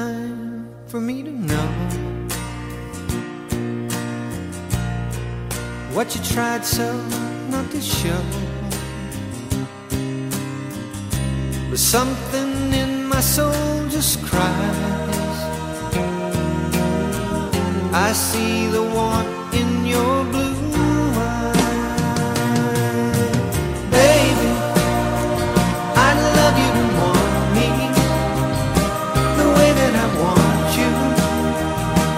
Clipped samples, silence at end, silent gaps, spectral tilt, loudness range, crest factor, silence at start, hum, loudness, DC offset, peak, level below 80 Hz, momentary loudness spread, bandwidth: under 0.1%; 0 s; none; -5 dB/octave; 9 LU; 18 dB; 0 s; none; -20 LUFS; under 0.1%; -2 dBFS; -34 dBFS; 12 LU; 16 kHz